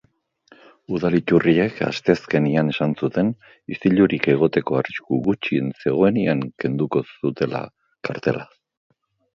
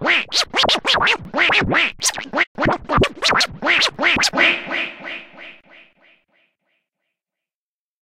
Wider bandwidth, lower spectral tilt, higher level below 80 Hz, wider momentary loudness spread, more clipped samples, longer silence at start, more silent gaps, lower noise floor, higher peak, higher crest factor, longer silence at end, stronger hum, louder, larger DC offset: second, 7.4 kHz vs 16.5 kHz; first, -8 dB/octave vs -2 dB/octave; second, -56 dBFS vs -42 dBFS; about the same, 10 LU vs 9 LU; neither; first, 0.9 s vs 0 s; second, none vs 2.47-2.55 s; second, -58 dBFS vs under -90 dBFS; about the same, 0 dBFS vs -2 dBFS; about the same, 20 dB vs 18 dB; second, 0.9 s vs 2.5 s; neither; second, -21 LUFS vs -16 LUFS; neither